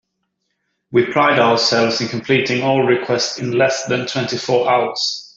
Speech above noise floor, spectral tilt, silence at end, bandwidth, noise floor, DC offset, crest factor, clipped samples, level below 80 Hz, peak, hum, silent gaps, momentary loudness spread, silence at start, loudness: 56 dB; -4 dB/octave; 0.1 s; 7.8 kHz; -72 dBFS; under 0.1%; 16 dB; under 0.1%; -60 dBFS; -2 dBFS; none; none; 7 LU; 0.9 s; -16 LUFS